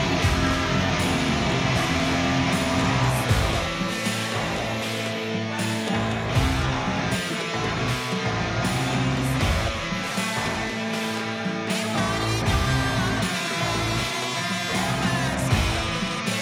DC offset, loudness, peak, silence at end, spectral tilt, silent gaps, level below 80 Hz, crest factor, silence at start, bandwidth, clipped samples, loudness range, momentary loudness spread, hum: under 0.1%; -24 LUFS; -8 dBFS; 0 s; -4.5 dB/octave; none; -36 dBFS; 16 dB; 0 s; 16.5 kHz; under 0.1%; 3 LU; 4 LU; none